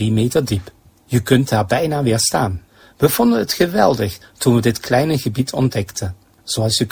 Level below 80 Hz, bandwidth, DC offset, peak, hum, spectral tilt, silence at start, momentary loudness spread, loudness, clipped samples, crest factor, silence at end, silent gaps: -40 dBFS; 16 kHz; under 0.1%; 0 dBFS; none; -5 dB/octave; 0 s; 9 LU; -17 LUFS; under 0.1%; 16 dB; 0.05 s; none